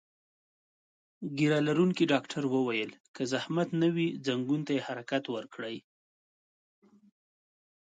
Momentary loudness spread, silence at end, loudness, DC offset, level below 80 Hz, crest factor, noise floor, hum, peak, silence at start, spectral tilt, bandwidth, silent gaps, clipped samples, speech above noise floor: 13 LU; 2.05 s; -31 LUFS; under 0.1%; -78 dBFS; 20 dB; under -90 dBFS; none; -12 dBFS; 1.2 s; -6 dB/octave; 9.2 kHz; 3.00-3.14 s; under 0.1%; over 60 dB